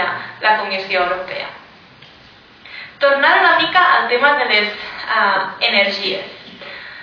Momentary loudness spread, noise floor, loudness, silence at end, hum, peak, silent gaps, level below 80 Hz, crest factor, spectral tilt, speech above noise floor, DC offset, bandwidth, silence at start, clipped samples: 20 LU; -44 dBFS; -15 LUFS; 0 s; none; 0 dBFS; none; -60 dBFS; 16 dB; -4 dB/octave; 29 dB; under 0.1%; 5.4 kHz; 0 s; under 0.1%